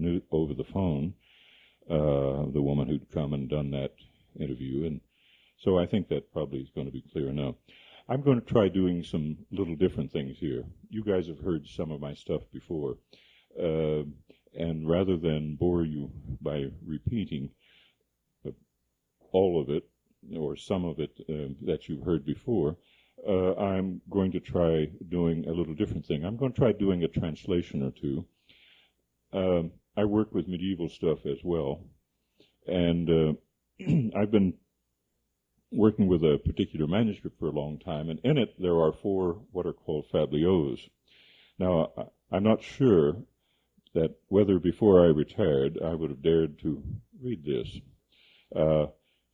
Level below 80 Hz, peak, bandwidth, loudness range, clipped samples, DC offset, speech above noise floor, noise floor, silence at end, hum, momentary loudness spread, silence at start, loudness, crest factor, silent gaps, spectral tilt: -52 dBFS; -8 dBFS; 7.6 kHz; 7 LU; under 0.1%; under 0.1%; 51 dB; -79 dBFS; 0.45 s; none; 12 LU; 0 s; -29 LUFS; 22 dB; none; -9 dB/octave